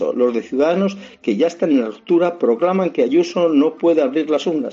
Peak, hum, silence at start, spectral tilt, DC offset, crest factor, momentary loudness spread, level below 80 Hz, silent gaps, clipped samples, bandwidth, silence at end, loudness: -6 dBFS; none; 0 s; -6.5 dB/octave; under 0.1%; 12 dB; 3 LU; -66 dBFS; none; under 0.1%; 7.6 kHz; 0 s; -17 LUFS